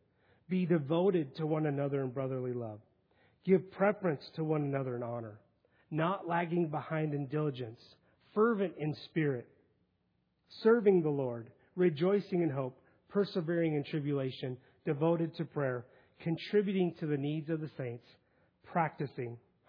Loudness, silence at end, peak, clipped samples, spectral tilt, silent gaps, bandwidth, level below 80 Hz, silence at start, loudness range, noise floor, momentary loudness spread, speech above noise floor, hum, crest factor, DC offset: -34 LUFS; 0.3 s; -14 dBFS; under 0.1%; -7 dB/octave; none; 5.2 kHz; -80 dBFS; 0.5 s; 4 LU; -77 dBFS; 12 LU; 45 dB; none; 20 dB; under 0.1%